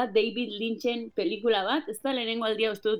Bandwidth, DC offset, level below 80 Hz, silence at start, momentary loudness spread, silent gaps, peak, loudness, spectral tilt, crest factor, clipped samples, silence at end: 16 kHz; under 0.1%; -70 dBFS; 0 s; 5 LU; none; -12 dBFS; -28 LUFS; -4 dB/octave; 16 dB; under 0.1%; 0 s